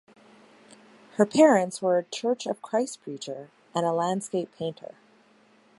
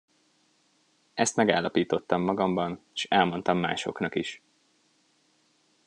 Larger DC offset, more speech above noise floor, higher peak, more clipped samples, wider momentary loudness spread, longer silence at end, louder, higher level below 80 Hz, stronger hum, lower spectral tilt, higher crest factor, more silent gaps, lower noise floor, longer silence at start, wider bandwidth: neither; second, 34 dB vs 41 dB; about the same, -6 dBFS vs -4 dBFS; neither; first, 19 LU vs 9 LU; second, 1.05 s vs 1.5 s; about the same, -26 LUFS vs -27 LUFS; second, -76 dBFS vs -70 dBFS; neither; about the same, -5 dB/octave vs -4.5 dB/octave; about the same, 22 dB vs 24 dB; neither; second, -60 dBFS vs -68 dBFS; about the same, 1.2 s vs 1.15 s; about the same, 11.5 kHz vs 11 kHz